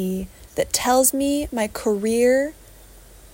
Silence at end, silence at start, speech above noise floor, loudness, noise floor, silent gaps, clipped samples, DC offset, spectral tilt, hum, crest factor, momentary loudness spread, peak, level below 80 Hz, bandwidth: 0.05 s; 0 s; 25 dB; -21 LUFS; -46 dBFS; none; under 0.1%; under 0.1%; -3.5 dB/octave; none; 18 dB; 12 LU; -4 dBFS; -46 dBFS; 16.5 kHz